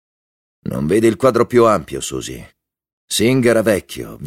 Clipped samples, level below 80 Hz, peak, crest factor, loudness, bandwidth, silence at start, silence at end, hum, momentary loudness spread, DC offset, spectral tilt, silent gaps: under 0.1%; -46 dBFS; -2 dBFS; 16 dB; -16 LUFS; 16.5 kHz; 0.65 s; 0 s; none; 16 LU; under 0.1%; -5 dB/octave; 2.93-3.08 s